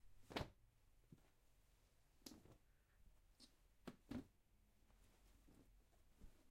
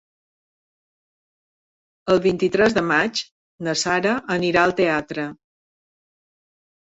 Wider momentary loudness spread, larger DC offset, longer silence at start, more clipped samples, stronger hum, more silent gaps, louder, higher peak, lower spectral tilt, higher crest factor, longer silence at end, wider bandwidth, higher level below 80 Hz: about the same, 11 LU vs 12 LU; neither; second, 0 s vs 2.05 s; neither; neither; second, none vs 3.31-3.58 s; second, -57 LUFS vs -20 LUFS; second, -30 dBFS vs -4 dBFS; about the same, -5 dB/octave vs -4.5 dB/octave; first, 32 dB vs 20 dB; second, 0 s vs 1.5 s; first, 16 kHz vs 8 kHz; second, -72 dBFS vs -56 dBFS